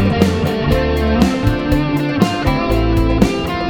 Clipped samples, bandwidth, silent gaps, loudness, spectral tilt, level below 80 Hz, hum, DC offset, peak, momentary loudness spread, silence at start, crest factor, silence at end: under 0.1%; 20 kHz; none; -16 LUFS; -7 dB/octave; -22 dBFS; none; under 0.1%; 0 dBFS; 3 LU; 0 s; 14 dB; 0 s